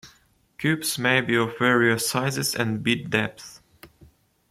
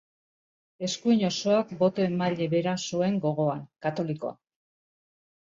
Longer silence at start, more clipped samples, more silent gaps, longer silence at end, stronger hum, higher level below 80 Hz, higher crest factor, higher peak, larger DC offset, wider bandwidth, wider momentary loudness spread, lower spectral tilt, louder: second, 0.05 s vs 0.8 s; neither; neither; second, 0.65 s vs 1.15 s; neither; first, -62 dBFS vs -70 dBFS; about the same, 20 dB vs 18 dB; first, -4 dBFS vs -12 dBFS; neither; first, 16 kHz vs 7.8 kHz; about the same, 8 LU vs 8 LU; second, -4 dB/octave vs -5.5 dB/octave; first, -23 LUFS vs -27 LUFS